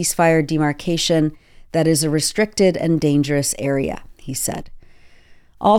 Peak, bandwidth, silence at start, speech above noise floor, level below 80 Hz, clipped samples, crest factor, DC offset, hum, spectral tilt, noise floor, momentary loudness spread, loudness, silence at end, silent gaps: -4 dBFS; 17 kHz; 0 s; 28 dB; -44 dBFS; under 0.1%; 14 dB; under 0.1%; none; -4.5 dB/octave; -46 dBFS; 8 LU; -19 LUFS; 0 s; none